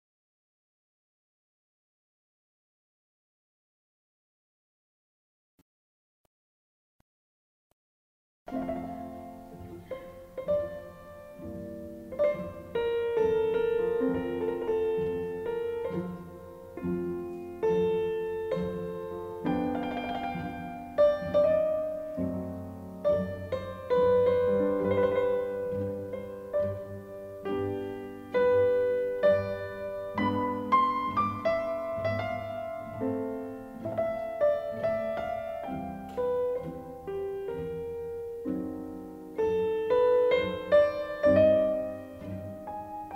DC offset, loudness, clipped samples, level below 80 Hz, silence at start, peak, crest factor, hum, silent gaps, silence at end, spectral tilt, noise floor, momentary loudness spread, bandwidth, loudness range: under 0.1%; -30 LUFS; under 0.1%; -58 dBFS; 8.5 s; -12 dBFS; 20 dB; none; none; 0 s; -7.5 dB/octave; under -90 dBFS; 16 LU; 16 kHz; 10 LU